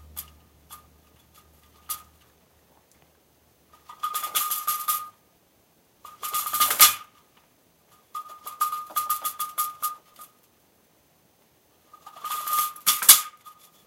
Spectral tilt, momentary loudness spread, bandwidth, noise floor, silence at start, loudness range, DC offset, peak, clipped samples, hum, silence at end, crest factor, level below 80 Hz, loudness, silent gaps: 2.5 dB/octave; 24 LU; 17 kHz; -63 dBFS; 0.15 s; 19 LU; under 0.1%; 0 dBFS; under 0.1%; none; 0.35 s; 28 dB; -66 dBFS; -22 LUFS; none